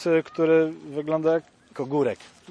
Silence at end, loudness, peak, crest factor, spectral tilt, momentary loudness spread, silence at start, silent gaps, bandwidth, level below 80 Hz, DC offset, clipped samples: 0.25 s; -24 LUFS; -10 dBFS; 14 dB; -7 dB/octave; 14 LU; 0 s; none; 9.6 kHz; -72 dBFS; under 0.1%; under 0.1%